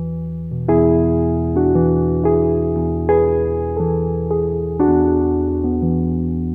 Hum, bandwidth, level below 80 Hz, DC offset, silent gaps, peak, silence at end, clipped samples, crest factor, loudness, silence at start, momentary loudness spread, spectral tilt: none; 2.6 kHz; -30 dBFS; 0.7%; none; -4 dBFS; 0 s; under 0.1%; 14 dB; -17 LUFS; 0 s; 6 LU; -13.5 dB/octave